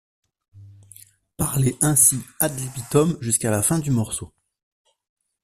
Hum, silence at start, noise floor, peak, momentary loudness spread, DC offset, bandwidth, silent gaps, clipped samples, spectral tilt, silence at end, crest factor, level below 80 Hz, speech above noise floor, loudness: none; 0.55 s; -50 dBFS; 0 dBFS; 12 LU; under 0.1%; 16 kHz; none; under 0.1%; -4.5 dB/octave; 1.15 s; 24 dB; -50 dBFS; 29 dB; -20 LUFS